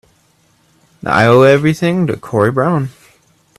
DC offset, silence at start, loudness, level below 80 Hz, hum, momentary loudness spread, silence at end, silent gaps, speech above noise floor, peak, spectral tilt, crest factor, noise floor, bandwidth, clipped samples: under 0.1%; 1.05 s; -12 LUFS; -50 dBFS; none; 11 LU; 0.7 s; none; 43 dB; 0 dBFS; -7 dB/octave; 14 dB; -55 dBFS; 14 kHz; under 0.1%